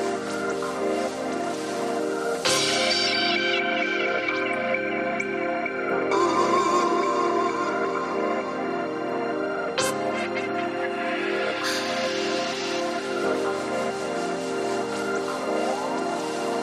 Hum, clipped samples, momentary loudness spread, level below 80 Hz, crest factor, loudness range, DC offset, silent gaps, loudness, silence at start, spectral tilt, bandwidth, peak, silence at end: none; under 0.1%; 7 LU; -68 dBFS; 16 dB; 4 LU; under 0.1%; none; -25 LUFS; 0 s; -3 dB/octave; 14 kHz; -10 dBFS; 0 s